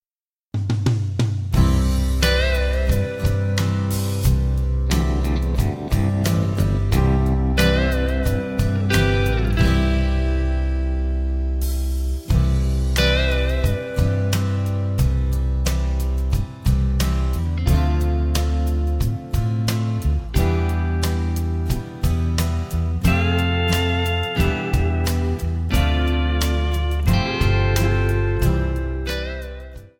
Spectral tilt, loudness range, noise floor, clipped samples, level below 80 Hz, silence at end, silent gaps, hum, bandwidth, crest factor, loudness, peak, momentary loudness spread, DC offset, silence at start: -6 dB/octave; 2 LU; under -90 dBFS; under 0.1%; -22 dBFS; 0.1 s; none; none; 17.5 kHz; 16 dB; -21 LUFS; -2 dBFS; 5 LU; under 0.1%; 0.55 s